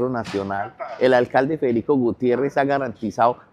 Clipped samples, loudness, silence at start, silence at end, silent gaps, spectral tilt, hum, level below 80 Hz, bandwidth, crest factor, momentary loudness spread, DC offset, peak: under 0.1%; -21 LUFS; 0 s; 0.15 s; none; -7 dB/octave; none; -58 dBFS; 10.5 kHz; 18 dB; 9 LU; under 0.1%; -4 dBFS